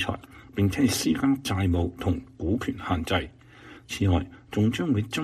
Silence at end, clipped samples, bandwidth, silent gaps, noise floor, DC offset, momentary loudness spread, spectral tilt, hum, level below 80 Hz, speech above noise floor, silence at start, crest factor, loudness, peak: 0 s; under 0.1%; 15 kHz; none; -49 dBFS; under 0.1%; 8 LU; -5.5 dB/octave; none; -44 dBFS; 23 dB; 0 s; 16 dB; -27 LUFS; -10 dBFS